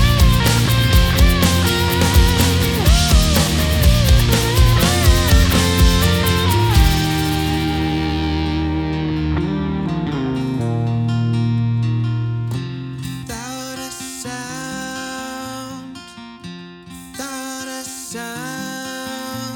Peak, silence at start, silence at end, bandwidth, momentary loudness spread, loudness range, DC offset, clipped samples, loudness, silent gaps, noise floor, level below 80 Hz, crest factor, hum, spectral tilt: -2 dBFS; 0 s; 0 s; over 20 kHz; 14 LU; 15 LU; under 0.1%; under 0.1%; -17 LUFS; none; -36 dBFS; -22 dBFS; 16 dB; none; -5 dB/octave